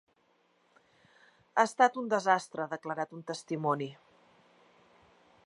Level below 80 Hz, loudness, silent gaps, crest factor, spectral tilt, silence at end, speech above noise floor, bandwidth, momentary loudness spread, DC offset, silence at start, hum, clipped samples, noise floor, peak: -84 dBFS; -31 LUFS; none; 24 dB; -4.5 dB/octave; 1.55 s; 40 dB; 11.5 kHz; 12 LU; under 0.1%; 1.55 s; none; under 0.1%; -71 dBFS; -10 dBFS